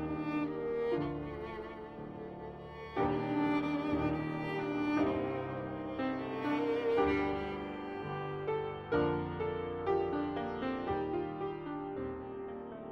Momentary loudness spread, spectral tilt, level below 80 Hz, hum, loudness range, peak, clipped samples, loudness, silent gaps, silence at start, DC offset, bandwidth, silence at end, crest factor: 11 LU; -8.5 dB/octave; -56 dBFS; none; 3 LU; -18 dBFS; under 0.1%; -36 LUFS; none; 0 s; under 0.1%; 6.2 kHz; 0 s; 16 dB